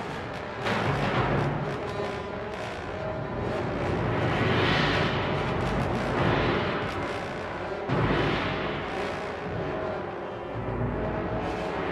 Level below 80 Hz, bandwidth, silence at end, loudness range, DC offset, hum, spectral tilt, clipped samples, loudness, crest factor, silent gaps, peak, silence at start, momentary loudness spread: -44 dBFS; 12.5 kHz; 0 s; 4 LU; under 0.1%; none; -6.5 dB/octave; under 0.1%; -28 LUFS; 16 dB; none; -12 dBFS; 0 s; 9 LU